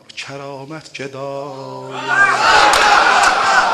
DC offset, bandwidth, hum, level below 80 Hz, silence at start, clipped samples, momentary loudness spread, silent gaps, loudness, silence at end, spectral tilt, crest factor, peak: under 0.1%; 14.5 kHz; none; -46 dBFS; 0.15 s; under 0.1%; 20 LU; none; -11 LUFS; 0 s; -1.5 dB/octave; 16 dB; 0 dBFS